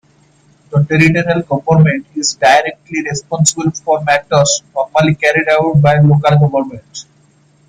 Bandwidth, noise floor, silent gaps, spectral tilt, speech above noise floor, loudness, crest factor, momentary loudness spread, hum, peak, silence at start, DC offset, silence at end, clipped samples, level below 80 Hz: 10 kHz; -50 dBFS; none; -5 dB/octave; 38 dB; -12 LUFS; 12 dB; 10 LU; none; 0 dBFS; 0.7 s; under 0.1%; 0.65 s; under 0.1%; -48 dBFS